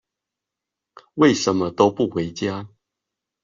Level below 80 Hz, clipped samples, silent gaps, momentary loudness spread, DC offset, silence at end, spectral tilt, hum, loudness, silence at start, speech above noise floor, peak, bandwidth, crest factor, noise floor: -60 dBFS; under 0.1%; none; 12 LU; under 0.1%; 0.75 s; -5 dB/octave; none; -20 LUFS; 1.15 s; 66 dB; -4 dBFS; 7.6 kHz; 20 dB; -85 dBFS